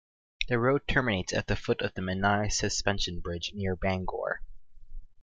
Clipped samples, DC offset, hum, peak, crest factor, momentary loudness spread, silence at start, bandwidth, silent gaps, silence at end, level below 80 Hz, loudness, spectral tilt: under 0.1%; under 0.1%; none; -10 dBFS; 20 dB; 8 LU; 0.4 s; 9.6 kHz; none; 0.15 s; -42 dBFS; -30 LUFS; -4 dB/octave